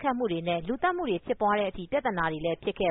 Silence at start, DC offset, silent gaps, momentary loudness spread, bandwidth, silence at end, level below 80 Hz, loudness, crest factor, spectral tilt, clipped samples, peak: 0 s; under 0.1%; none; 4 LU; 4 kHz; 0 s; -52 dBFS; -29 LUFS; 14 dB; -4 dB/octave; under 0.1%; -14 dBFS